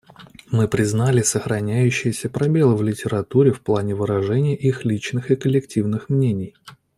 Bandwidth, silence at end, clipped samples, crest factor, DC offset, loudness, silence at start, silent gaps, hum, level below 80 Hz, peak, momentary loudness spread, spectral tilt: 13.5 kHz; 0.25 s; under 0.1%; 16 dB; under 0.1%; -20 LUFS; 0.2 s; none; none; -54 dBFS; -2 dBFS; 6 LU; -6.5 dB/octave